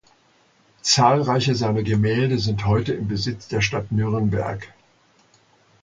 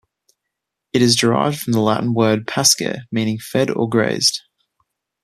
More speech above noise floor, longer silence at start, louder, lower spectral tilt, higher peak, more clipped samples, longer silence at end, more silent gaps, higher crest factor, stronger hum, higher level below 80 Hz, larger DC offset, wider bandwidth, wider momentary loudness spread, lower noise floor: second, 38 dB vs 63 dB; about the same, 0.85 s vs 0.95 s; second, -21 LUFS vs -17 LUFS; about the same, -5 dB/octave vs -4 dB/octave; about the same, -2 dBFS vs 0 dBFS; neither; first, 1.15 s vs 0.85 s; neither; about the same, 20 dB vs 18 dB; neither; first, -46 dBFS vs -58 dBFS; neither; second, 9.2 kHz vs 14.5 kHz; about the same, 9 LU vs 8 LU; second, -59 dBFS vs -80 dBFS